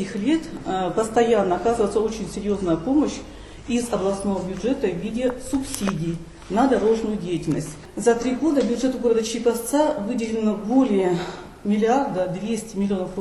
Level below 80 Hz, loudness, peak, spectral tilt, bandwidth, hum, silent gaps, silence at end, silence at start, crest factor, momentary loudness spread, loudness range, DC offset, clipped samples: -46 dBFS; -23 LUFS; -6 dBFS; -5.5 dB/octave; 13 kHz; none; none; 0 s; 0 s; 16 dB; 8 LU; 3 LU; under 0.1%; under 0.1%